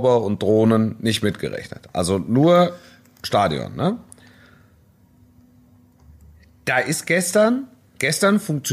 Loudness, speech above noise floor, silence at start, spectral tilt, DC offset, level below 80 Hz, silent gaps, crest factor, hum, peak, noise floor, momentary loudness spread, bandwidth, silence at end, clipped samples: -20 LUFS; 35 dB; 0 s; -5 dB/octave; under 0.1%; -54 dBFS; none; 16 dB; none; -6 dBFS; -54 dBFS; 13 LU; 15.5 kHz; 0 s; under 0.1%